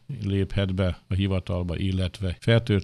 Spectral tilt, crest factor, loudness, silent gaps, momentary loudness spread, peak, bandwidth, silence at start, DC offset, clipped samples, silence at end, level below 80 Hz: -7.5 dB/octave; 18 dB; -26 LUFS; none; 6 LU; -6 dBFS; 11 kHz; 0.1 s; under 0.1%; under 0.1%; 0 s; -42 dBFS